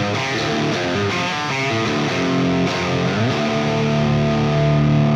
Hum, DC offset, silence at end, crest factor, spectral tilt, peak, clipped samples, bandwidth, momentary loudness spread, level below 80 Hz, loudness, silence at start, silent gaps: none; under 0.1%; 0 s; 12 dB; -6 dB/octave; -6 dBFS; under 0.1%; 9.6 kHz; 3 LU; -42 dBFS; -19 LUFS; 0 s; none